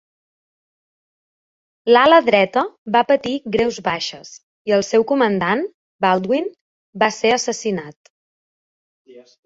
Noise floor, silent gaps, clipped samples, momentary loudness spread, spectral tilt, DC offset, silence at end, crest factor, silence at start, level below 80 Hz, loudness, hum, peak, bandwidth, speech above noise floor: under -90 dBFS; 2.78-2.85 s, 4.43-4.65 s, 5.74-5.99 s, 6.61-6.93 s, 7.96-8.04 s, 8.10-9.05 s; under 0.1%; 14 LU; -4 dB/octave; under 0.1%; 0.25 s; 18 dB; 1.85 s; -58 dBFS; -17 LUFS; none; -2 dBFS; 8 kHz; over 73 dB